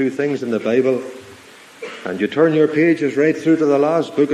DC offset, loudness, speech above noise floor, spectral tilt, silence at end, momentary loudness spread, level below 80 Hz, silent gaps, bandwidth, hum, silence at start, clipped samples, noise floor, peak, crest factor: under 0.1%; -17 LUFS; 26 dB; -7 dB/octave; 0 s; 16 LU; -66 dBFS; none; 11 kHz; none; 0 s; under 0.1%; -42 dBFS; -2 dBFS; 16 dB